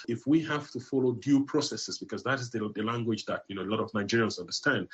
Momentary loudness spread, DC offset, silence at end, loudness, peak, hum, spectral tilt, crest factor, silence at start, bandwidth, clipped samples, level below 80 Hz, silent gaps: 8 LU; under 0.1%; 0.1 s; -30 LUFS; -14 dBFS; none; -5 dB/octave; 16 dB; 0 s; 8.4 kHz; under 0.1%; -72 dBFS; none